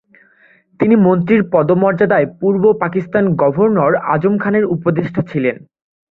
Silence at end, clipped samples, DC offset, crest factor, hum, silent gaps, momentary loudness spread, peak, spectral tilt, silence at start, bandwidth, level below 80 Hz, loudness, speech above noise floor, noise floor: 0.55 s; under 0.1%; under 0.1%; 14 dB; none; none; 7 LU; 0 dBFS; -11 dB/octave; 0.8 s; 4.2 kHz; -54 dBFS; -14 LUFS; 38 dB; -51 dBFS